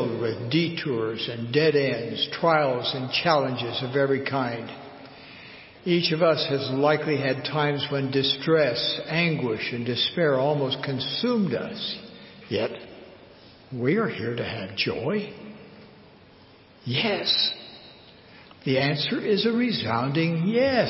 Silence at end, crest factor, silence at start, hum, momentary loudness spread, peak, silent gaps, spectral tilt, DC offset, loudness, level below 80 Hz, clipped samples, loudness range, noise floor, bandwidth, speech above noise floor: 0 s; 18 dB; 0 s; none; 17 LU; -6 dBFS; none; -9 dB/octave; under 0.1%; -25 LUFS; -62 dBFS; under 0.1%; 6 LU; -52 dBFS; 5.8 kHz; 28 dB